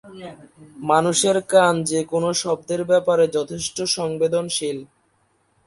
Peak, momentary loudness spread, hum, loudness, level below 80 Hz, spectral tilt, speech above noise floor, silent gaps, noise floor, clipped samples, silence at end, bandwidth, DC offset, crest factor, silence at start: -2 dBFS; 13 LU; none; -20 LUFS; -60 dBFS; -3.5 dB/octave; 44 dB; none; -64 dBFS; under 0.1%; 0.8 s; 11.5 kHz; under 0.1%; 18 dB; 0.05 s